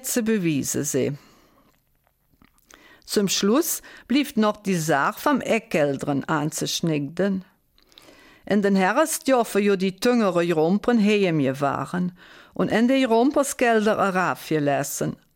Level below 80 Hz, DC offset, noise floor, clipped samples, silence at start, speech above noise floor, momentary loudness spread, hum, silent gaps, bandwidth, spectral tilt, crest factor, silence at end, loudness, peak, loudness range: -60 dBFS; under 0.1%; -66 dBFS; under 0.1%; 0 s; 44 dB; 7 LU; none; none; 17 kHz; -4.5 dB/octave; 14 dB; 0.2 s; -22 LUFS; -8 dBFS; 5 LU